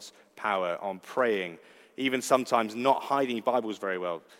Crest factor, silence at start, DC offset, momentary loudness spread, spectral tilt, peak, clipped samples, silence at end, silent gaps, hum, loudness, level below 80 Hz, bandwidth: 22 dB; 0 s; under 0.1%; 9 LU; -4 dB/octave; -8 dBFS; under 0.1%; 0.2 s; none; none; -29 LUFS; -86 dBFS; 16 kHz